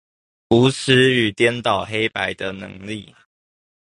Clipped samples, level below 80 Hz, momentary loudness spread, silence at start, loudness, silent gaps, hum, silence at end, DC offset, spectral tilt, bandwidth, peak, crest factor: under 0.1%; -52 dBFS; 17 LU; 0.5 s; -18 LUFS; none; none; 0.95 s; under 0.1%; -5 dB/octave; 11.5 kHz; -2 dBFS; 18 dB